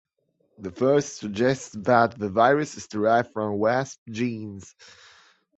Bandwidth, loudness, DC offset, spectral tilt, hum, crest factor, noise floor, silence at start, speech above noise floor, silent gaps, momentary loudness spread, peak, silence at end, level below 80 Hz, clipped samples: 8.2 kHz; -24 LUFS; under 0.1%; -5.5 dB/octave; none; 22 dB; -70 dBFS; 0.6 s; 46 dB; 3.98-4.06 s; 15 LU; -4 dBFS; 0.9 s; -60 dBFS; under 0.1%